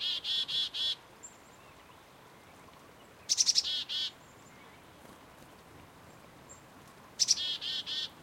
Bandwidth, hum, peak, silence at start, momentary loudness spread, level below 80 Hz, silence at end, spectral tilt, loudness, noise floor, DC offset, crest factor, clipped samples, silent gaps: 16 kHz; none; -12 dBFS; 0 s; 28 LU; -72 dBFS; 0 s; 1.5 dB/octave; -30 LUFS; -56 dBFS; under 0.1%; 26 dB; under 0.1%; none